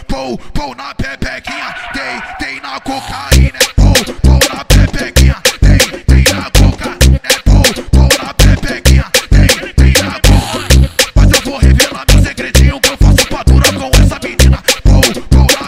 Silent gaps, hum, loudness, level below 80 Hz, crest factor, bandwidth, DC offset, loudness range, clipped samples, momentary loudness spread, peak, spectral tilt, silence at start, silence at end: none; none; -10 LUFS; -12 dBFS; 8 dB; 16.5 kHz; under 0.1%; 4 LU; 1%; 11 LU; 0 dBFS; -4 dB/octave; 0 s; 0 s